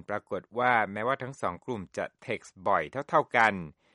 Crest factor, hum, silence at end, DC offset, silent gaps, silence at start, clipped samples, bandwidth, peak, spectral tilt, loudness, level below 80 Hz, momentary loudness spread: 22 dB; none; 0.25 s; under 0.1%; none; 0.1 s; under 0.1%; 11.5 kHz; -8 dBFS; -5.5 dB/octave; -29 LUFS; -66 dBFS; 12 LU